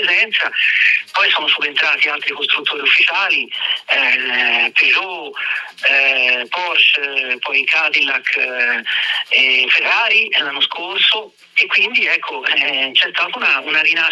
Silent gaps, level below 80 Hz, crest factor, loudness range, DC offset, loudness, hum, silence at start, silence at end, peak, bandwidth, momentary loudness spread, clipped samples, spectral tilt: none; -84 dBFS; 14 dB; 1 LU; under 0.1%; -13 LUFS; none; 0 s; 0 s; -2 dBFS; 12 kHz; 6 LU; under 0.1%; -0.5 dB/octave